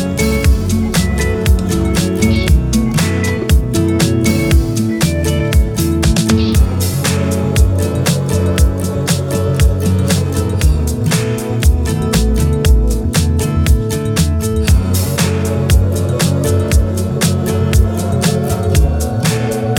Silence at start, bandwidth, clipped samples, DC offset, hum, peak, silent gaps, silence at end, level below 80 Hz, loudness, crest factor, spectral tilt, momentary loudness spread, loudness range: 0 s; 18 kHz; under 0.1%; under 0.1%; none; 0 dBFS; none; 0 s; -18 dBFS; -14 LUFS; 12 dB; -5.5 dB/octave; 3 LU; 1 LU